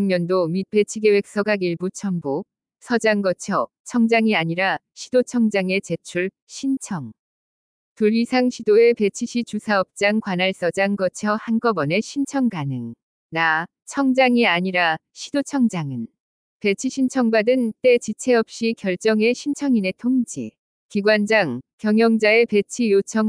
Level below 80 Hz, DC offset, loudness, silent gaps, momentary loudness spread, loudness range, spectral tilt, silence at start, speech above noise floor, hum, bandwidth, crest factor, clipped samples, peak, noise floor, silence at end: -68 dBFS; under 0.1%; -20 LUFS; 3.80-3.85 s, 6.42-6.47 s, 7.19-7.96 s, 13.03-13.30 s, 16.20-16.60 s, 20.59-20.89 s, 21.73-21.78 s; 11 LU; 3 LU; -5 dB/octave; 0 s; over 70 dB; none; 10.5 kHz; 16 dB; under 0.1%; -4 dBFS; under -90 dBFS; 0 s